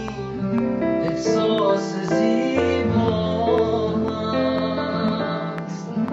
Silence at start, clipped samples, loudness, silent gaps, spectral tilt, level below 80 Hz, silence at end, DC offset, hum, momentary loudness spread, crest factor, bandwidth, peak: 0 s; under 0.1%; -22 LUFS; none; -6.5 dB/octave; -48 dBFS; 0 s; under 0.1%; none; 7 LU; 16 dB; 8 kHz; -6 dBFS